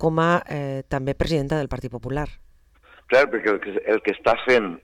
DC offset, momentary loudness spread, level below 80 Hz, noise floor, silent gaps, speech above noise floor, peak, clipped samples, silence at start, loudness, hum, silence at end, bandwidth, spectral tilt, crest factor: under 0.1%; 11 LU; -40 dBFS; -53 dBFS; none; 31 dB; -6 dBFS; under 0.1%; 0 s; -22 LUFS; none; 0.05 s; 12.5 kHz; -6.5 dB/octave; 16 dB